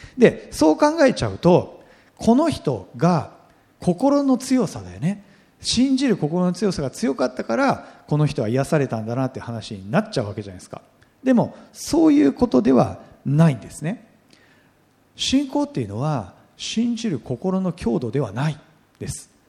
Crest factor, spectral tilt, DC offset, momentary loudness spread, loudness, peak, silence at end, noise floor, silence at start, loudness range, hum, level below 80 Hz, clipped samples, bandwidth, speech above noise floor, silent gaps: 20 dB; -6 dB/octave; under 0.1%; 15 LU; -21 LUFS; 0 dBFS; 0.25 s; -58 dBFS; 0 s; 6 LU; none; -50 dBFS; under 0.1%; 14 kHz; 38 dB; none